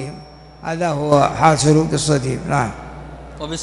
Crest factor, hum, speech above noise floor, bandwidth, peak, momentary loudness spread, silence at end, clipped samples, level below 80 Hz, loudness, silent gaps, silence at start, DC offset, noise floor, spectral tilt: 18 dB; none; 22 dB; 11.5 kHz; 0 dBFS; 21 LU; 0 s; under 0.1%; -40 dBFS; -17 LUFS; none; 0 s; under 0.1%; -38 dBFS; -5.5 dB/octave